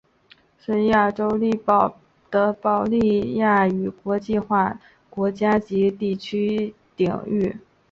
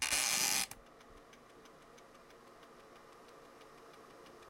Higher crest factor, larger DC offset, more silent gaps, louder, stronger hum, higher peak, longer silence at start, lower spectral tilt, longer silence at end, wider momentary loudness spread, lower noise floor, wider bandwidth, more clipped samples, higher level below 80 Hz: second, 18 dB vs 24 dB; neither; neither; first, -22 LUFS vs -32 LUFS; neither; first, -4 dBFS vs -18 dBFS; first, 0.7 s vs 0 s; first, -8 dB/octave vs 1 dB/octave; first, 0.35 s vs 0 s; second, 8 LU vs 27 LU; about the same, -56 dBFS vs -59 dBFS; second, 7.2 kHz vs 16.5 kHz; neither; first, -54 dBFS vs -70 dBFS